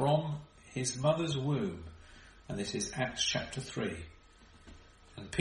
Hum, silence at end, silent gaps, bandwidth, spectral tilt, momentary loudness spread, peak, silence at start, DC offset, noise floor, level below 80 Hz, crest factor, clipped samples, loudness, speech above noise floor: none; 0 s; none; 11 kHz; -4.5 dB/octave; 21 LU; -14 dBFS; 0 s; under 0.1%; -59 dBFS; -58 dBFS; 22 dB; under 0.1%; -35 LUFS; 25 dB